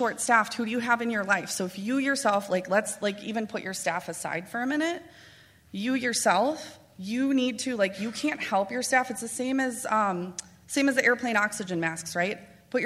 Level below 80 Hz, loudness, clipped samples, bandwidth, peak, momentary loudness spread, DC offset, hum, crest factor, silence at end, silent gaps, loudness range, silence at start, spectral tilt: -70 dBFS; -27 LUFS; under 0.1%; 16 kHz; -6 dBFS; 9 LU; under 0.1%; none; 22 dB; 0 s; none; 3 LU; 0 s; -3.5 dB/octave